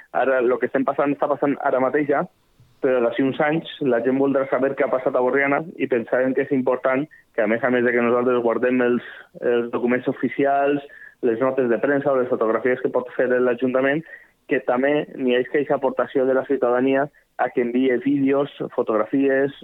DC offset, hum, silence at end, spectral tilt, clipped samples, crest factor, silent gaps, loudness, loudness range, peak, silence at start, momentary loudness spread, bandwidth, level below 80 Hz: under 0.1%; none; 0.05 s; -8.5 dB/octave; under 0.1%; 14 dB; none; -21 LUFS; 1 LU; -6 dBFS; 0.15 s; 5 LU; 4.1 kHz; -70 dBFS